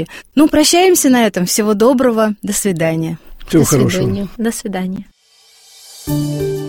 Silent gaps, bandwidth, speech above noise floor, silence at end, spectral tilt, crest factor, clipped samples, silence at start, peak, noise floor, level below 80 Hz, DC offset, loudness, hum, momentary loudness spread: none; 16.5 kHz; 36 dB; 0 s; -4.5 dB/octave; 14 dB; under 0.1%; 0 s; 0 dBFS; -49 dBFS; -40 dBFS; under 0.1%; -14 LUFS; none; 12 LU